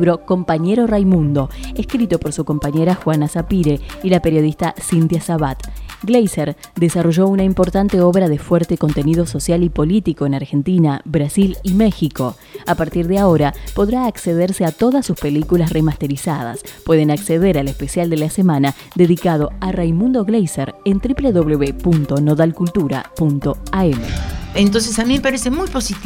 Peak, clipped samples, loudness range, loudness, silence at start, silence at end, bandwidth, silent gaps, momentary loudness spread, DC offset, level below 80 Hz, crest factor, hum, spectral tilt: 0 dBFS; under 0.1%; 2 LU; -16 LUFS; 0 s; 0 s; over 20 kHz; none; 7 LU; under 0.1%; -32 dBFS; 16 dB; none; -6.5 dB/octave